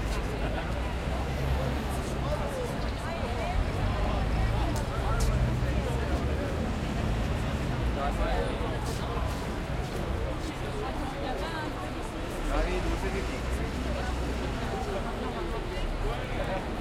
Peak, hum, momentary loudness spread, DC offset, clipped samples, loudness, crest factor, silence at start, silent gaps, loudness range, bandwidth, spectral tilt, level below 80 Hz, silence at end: -16 dBFS; none; 4 LU; under 0.1%; under 0.1%; -32 LUFS; 14 dB; 0 s; none; 3 LU; 15 kHz; -6 dB/octave; -34 dBFS; 0 s